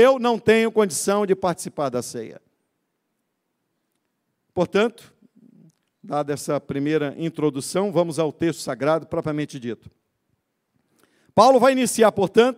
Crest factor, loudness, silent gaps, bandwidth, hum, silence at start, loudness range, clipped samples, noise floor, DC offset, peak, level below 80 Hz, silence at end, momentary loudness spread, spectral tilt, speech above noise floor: 20 dB; -21 LUFS; none; 16 kHz; none; 0 s; 8 LU; under 0.1%; -76 dBFS; under 0.1%; -2 dBFS; -64 dBFS; 0.05 s; 12 LU; -5 dB/octave; 55 dB